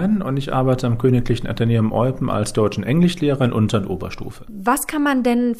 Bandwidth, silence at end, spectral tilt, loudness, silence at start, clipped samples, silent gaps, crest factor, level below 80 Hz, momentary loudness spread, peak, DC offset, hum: 15.5 kHz; 0 s; -6.5 dB/octave; -19 LUFS; 0 s; under 0.1%; none; 14 dB; -36 dBFS; 7 LU; -6 dBFS; under 0.1%; none